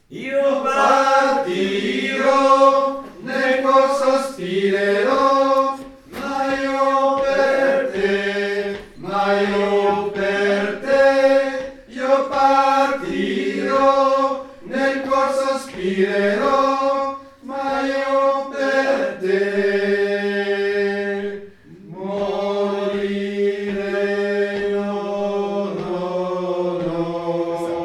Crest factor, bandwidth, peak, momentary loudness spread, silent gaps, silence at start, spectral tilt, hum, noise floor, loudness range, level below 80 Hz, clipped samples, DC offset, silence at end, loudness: 16 dB; 12 kHz; -2 dBFS; 9 LU; none; 0.1 s; -5 dB/octave; none; -40 dBFS; 5 LU; -54 dBFS; under 0.1%; under 0.1%; 0 s; -19 LUFS